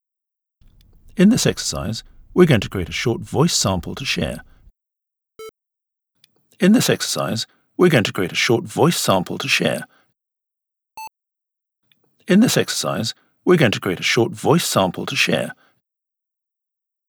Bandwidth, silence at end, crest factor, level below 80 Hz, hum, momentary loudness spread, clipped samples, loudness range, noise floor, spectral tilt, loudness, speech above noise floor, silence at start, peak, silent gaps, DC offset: over 20 kHz; 1.55 s; 20 dB; -48 dBFS; none; 12 LU; under 0.1%; 5 LU; -84 dBFS; -4.5 dB/octave; -18 LUFS; 66 dB; 1.15 s; 0 dBFS; none; under 0.1%